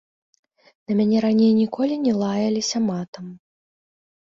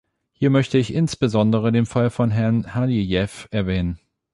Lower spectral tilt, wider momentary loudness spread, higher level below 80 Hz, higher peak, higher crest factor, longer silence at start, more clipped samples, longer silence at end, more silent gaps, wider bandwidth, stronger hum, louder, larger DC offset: about the same, -6 dB/octave vs -7 dB/octave; first, 15 LU vs 7 LU; second, -64 dBFS vs -42 dBFS; about the same, -8 dBFS vs -6 dBFS; about the same, 14 dB vs 16 dB; first, 0.9 s vs 0.4 s; neither; first, 1 s vs 0.4 s; first, 3.08-3.13 s vs none; second, 7.6 kHz vs 11.5 kHz; neither; about the same, -21 LUFS vs -21 LUFS; neither